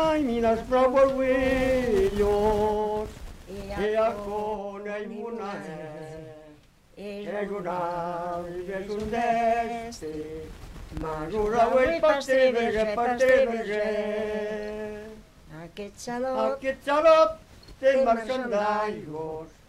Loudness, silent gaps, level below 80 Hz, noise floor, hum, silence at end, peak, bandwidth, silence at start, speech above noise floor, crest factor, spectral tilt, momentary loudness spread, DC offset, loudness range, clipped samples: -25 LUFS; none; -46 dBFS; -54 dBFS; none; 0.2 s; -8 dBFS; 15 kHz; 0 s; 29 dB; 18 dB; -5.5 dB/octave; 18 LU; under 0.1%; 10 LU; under 0.1%